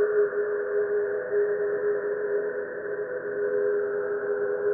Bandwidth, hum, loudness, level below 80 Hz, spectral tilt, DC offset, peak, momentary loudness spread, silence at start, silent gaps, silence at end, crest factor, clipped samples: 2.2 kHz; none; -27 LUFS; -72 dBFS; -11.5 dB/octave; under 0.1%; -14 dBFS; 6 LU; 0 s; none; 0 s; 12 dB; under 0.1%